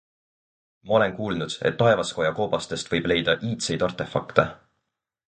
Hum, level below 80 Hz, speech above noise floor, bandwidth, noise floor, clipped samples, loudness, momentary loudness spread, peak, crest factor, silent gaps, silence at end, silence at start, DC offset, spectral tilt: none; -54 dBFS; 57 dB; 9.4 kHz; -81 dBFS; under 0.1%; -24 LUFS; 7 LU; 0 dBFS; 24 dB; none; 0.75 s; 0.85 s; under 0.1%; -4.5 dB/octave